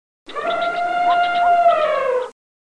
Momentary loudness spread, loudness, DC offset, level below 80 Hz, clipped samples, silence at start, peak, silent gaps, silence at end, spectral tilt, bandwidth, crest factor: 11 LU; -18 LUFS; under 0.1%; -58 dBFS; under 0.1%; 0.3 s; -6 dBFS; none; 0.3 s; -3 dB/octave; 10 kHz; 12 dB